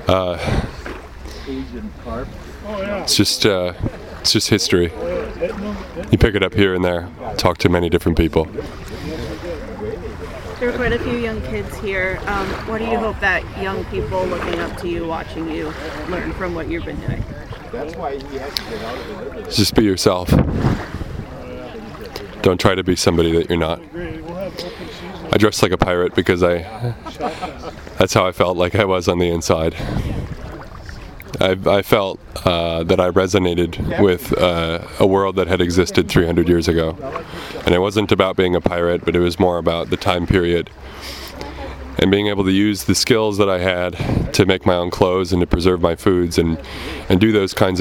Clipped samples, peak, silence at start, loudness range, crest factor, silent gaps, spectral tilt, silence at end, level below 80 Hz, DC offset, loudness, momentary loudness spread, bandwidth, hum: under 0.1%; 0 dBFS; 0 s; 6 LU; 18 dB; none; -5 dB/octave; 0 s; -34 dBFS; under 0.1%; -18 LUFS; 15 LU; 17 kHz; none